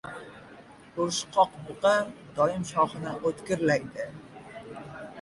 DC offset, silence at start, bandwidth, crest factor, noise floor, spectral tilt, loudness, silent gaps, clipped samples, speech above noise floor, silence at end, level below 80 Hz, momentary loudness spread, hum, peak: under 0.1%; 0.05 s; 11.5 kHz; 20 dB; -50 dBFS; -4.5 dB/octave; -28 LUFS; none; under 0.1%; 23 dB; 0 s; -62 dBFS; 19 LU; none; -10 dBFS